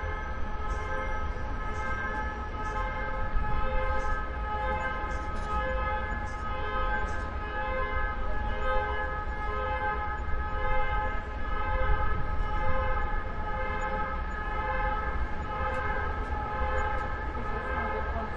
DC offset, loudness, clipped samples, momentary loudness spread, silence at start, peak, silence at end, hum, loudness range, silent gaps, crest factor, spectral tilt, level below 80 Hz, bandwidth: under 0.1%; -32 LUFS; under 0.1%; 4 LU; 0 s; -14 dBFS; 0 s; none; 1 LU; none; 16 dB; -6.5 dB/octave; -34 dBFS; 7.4 kHz